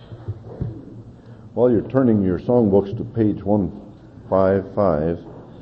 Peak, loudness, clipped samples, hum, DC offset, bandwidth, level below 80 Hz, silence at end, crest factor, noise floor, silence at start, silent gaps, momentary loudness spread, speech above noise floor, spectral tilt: -4 dBFS; -19 LUFS; under 0.1%; none; under 0.1%; 5.4 kHz; -46 dBFS; 0.05 s; 18 dB; -41 dBFS; 0 s; none; 17 LU; 23 dB; -11.5 dB/octave